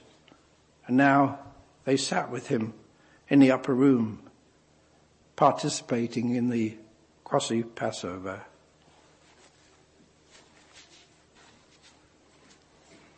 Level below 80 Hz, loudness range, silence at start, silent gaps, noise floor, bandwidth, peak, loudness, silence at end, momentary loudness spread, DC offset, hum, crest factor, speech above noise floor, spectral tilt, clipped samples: -70 dBFS; 11 LU; 0.85 s; none; -62 dBFS; 8.8 kHz; -6 dBFS; -26 LUFS; 4.75 s; 17 LU; under 0.1%; none; 22 dB; 37 dB; -5.5 dB/octave; under 0.1%